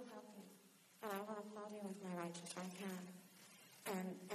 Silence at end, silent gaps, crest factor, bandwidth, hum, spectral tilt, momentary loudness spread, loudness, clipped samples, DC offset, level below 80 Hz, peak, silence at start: 0 s; none; 18 dB; 14 kHz; none; -4.5 dB/octave; 15 LU; -50 LUFS; under 0.1%; under 0.1%; under -90 dBFS; -32 dBFS; 0 s